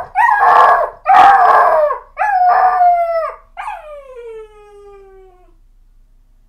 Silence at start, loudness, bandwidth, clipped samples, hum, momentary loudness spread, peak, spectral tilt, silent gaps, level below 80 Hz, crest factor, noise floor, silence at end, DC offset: 0 s; -10 LUFS; 13 kHz; under 0.1%; none; 24 LU; 0 dBFS; -3 dB/octave; none; -46 dBFS; 14 dB; -47 dBFS; 2.05 s; under 0.1%